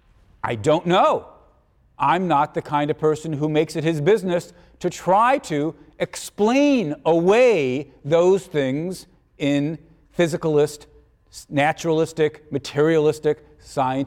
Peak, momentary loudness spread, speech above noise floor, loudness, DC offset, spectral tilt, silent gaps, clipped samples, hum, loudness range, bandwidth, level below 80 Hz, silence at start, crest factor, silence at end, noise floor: -6 dBFS; 12 LU; 38 dB; -21 LUFS; under 0.1%; -6 dB/octave; none; under 0.1%; none; 4 LU; 15.5 kHz; -56 dBFS; 0.45 s; 14 dB; 0 s; -58 dBFS